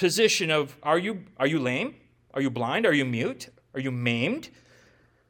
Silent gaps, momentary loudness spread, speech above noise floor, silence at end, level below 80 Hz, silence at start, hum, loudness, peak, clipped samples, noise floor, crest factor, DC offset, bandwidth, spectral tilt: none; 13 LU; 34 dB; 0.8 s; -70 dBFS; 0 s; none; -26 LUFS; -8 dBFS; under 0.1%; -60 dBFS; 18 dB; under 0.1%; 18 kHz; -4.5 dB/octave